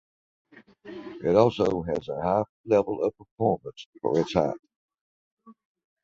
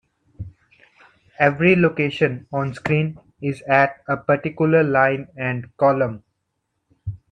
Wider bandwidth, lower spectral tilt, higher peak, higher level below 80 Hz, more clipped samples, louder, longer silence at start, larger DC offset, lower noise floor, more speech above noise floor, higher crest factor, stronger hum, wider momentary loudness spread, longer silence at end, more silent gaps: second, 7.6 kHz vs 9.4 kHz; about the same, -7.5 dB/octave vs -8 dB/octave; about the same, -4 dBFS vs -2 dBFS; about the same, -56 dBFS vs -54 dBFS; neither; second, -26 LUFS vs -20 LUFS; first, 0.85 s vs 0.4 s; neither; second, -47 dBFS vs -75 dBFS; second, 21 dB vs 56 dB; about the same, 24 dB vs 20 dB; neither; about the same, 19 LU vs 19 LU; first, 0.5 s vs 0.15 s; first, 2.49-2.64 s, 3.31-3.37 s, 3.86-3.93 s, 4.76-4.89 s, 5.01-5.37 s vs none